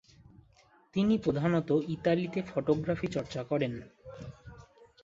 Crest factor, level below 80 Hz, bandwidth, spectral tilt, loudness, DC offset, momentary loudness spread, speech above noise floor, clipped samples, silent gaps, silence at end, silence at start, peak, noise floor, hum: 18 dB; -60 dBFS; 7.8 kHz; -7.5 dB/octave; -31 LUFS; under 0.1%; 19 LU; 33 dB; under 0.1%; none; 0.4 s; 0.95 s; -14 dBFS; -63 dBFS; none